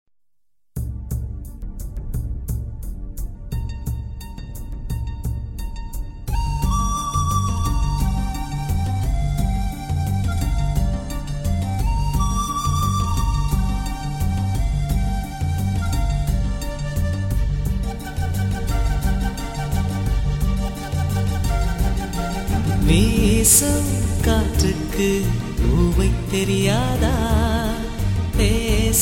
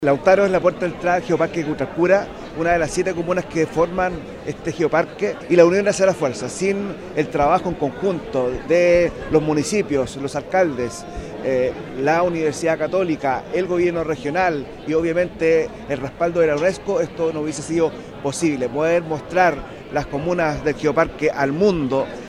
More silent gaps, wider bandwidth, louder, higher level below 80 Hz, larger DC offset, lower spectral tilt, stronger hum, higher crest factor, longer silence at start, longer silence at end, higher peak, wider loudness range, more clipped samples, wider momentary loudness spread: neither; first, 17 kHz vs 12.5 kHz; about the same, -22 LUFS vs -20 LUFS; first, -24 dBFS vs -44 dBFS; first, 0.2% vs under 0.1%; about the same, -5 dB/octave vs -5.5 dB/octave; neither; about the same, 18 dB vs 20 dB; first, 0.75 s vs 0 s; about the same, 0 s vs 0 s; second, -4 dBFS vs 0 dBFS; first, 12 LU vs 2 LU; neither; about the same, 11 LU vs 9 LU